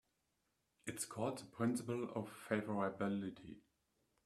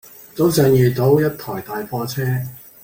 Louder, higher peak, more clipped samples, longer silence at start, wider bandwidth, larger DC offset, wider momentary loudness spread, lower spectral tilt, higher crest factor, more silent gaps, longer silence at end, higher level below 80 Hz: second, -43 LUFS vs -18 LUFS; second, -20 dBFS vs -2 dBFS; neither; first, 0.85 s vs 0.35 s; second, 14 kHz vs 17 kHz; neither; about the same, 12 LU vs 14 LU; about the same, -5.5 dB/octave vs -6.5 dB/octave; first, 22 dB vs 16 dB; neither; first, 0.65 s vs 0.25 s; second, -78 dBFS vs -50 dBFS